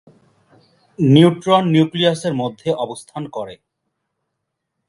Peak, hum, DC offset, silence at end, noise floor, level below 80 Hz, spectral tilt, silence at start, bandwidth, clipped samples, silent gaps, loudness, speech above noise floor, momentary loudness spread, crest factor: 0 dBFS; none; under 0.1%; 1.35 s; -77 dBFS; -60 dBFS; -7 dB/octave; 1 s; 11.5 kHz; under 0.1%; none; -16 LUFS; 61 dB; 17 LU; 18 dB